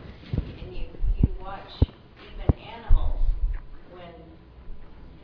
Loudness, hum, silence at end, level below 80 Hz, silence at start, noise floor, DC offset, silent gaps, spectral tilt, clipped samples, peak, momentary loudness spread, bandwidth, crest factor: -30 LUFS; none; 0.1 s; -28 dBFS; 0 s; -47 dBFS; under 0.1%; none; -10 dB/octave; under 0.1%; -6 dBFS; 21 LU; 4.9 kHz; 20 dB